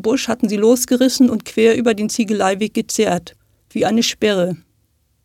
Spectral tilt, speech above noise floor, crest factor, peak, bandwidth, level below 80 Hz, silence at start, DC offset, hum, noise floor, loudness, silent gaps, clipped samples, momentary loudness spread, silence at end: -4 dB/octave; 46 dB; 16 dB; -2 dBFS; 16.5 kHz; -54 dBFS; 0 s; under 0.1%; none; -62 dBFS; -16 LUFS; none; under 0.1%; 7 LU; 0.7 s